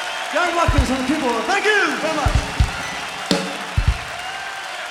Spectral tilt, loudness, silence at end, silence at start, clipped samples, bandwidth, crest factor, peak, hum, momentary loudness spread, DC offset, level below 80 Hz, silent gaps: -4.5 dB/octave; -20 LUFS; 0 s; 0 s; under 0.1%; 16 kHz; 18 dB; -2 dBFS; none; 10 LU; under 0.1%; -26 dBFS; none